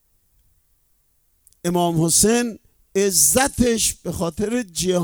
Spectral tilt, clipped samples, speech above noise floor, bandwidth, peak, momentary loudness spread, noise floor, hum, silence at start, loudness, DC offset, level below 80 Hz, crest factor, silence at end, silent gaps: -3.5 dB/octave; under 0.1%; 44 dB; over 20 kHz; -2 dBFS; 11 LU; -63 dBFS; none; 1.65 s; -19 LUFS; under 0.1%; -44 dBFS; 18 dB; 0 s; none